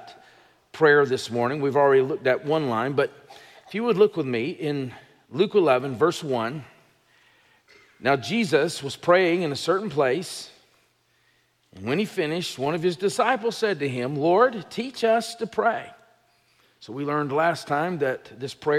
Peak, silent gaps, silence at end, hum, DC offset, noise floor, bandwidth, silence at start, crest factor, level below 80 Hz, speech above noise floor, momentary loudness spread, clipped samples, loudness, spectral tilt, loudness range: -6 dBFS; none; 0 s; none; under 0.1%; -65 dBFS; 14.5 kHz; 0 s; 18 dB; -72 dBFS; 42 dB; 12 LU; under 0.1%; -24 LUFS; -5.5 dB/octave; 5 LU